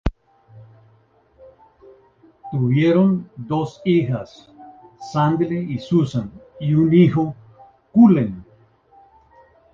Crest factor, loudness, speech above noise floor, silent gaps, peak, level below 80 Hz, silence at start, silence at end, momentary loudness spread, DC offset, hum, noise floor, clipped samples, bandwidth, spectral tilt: 18 dB; -19 LUFS; 39 dB; none; -2 dBFS; -42 dBFS; 0.05 s; 1.3 s; 15 LU; under 0.1%; none; -56 dBFS; under 0.1%; 7.2 kHz; -9 dB/octave